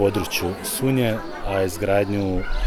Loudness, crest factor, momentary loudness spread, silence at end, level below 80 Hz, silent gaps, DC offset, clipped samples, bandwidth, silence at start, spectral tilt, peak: -23 LUFS; 14 dB; 5 LU; 0 s; -32 dBFS; none; under 0.1%; under 0.1%; 19.5 kHz; 0 s; -5 dB/octave; -6 dBFS